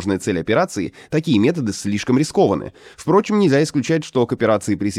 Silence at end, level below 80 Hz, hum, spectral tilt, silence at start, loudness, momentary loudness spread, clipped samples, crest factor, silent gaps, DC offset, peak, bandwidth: 0 s; -52 dBFS; none; -6 dB/octave; 0 s; -18 LUFS; 7 LU; under 0.1%; 16 dB; none; under 0.1%; -2 dBFS; 14 kHz